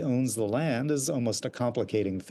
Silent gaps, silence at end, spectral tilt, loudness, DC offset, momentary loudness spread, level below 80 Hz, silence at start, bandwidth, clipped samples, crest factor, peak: none; 0 s; -5.5 dB/octave; -29 LUFS; under 0.1%; 3 LU; -70 dBFS; 0 s; 12.5 kHz; under 0.1%; 12 dB; -16 dBFS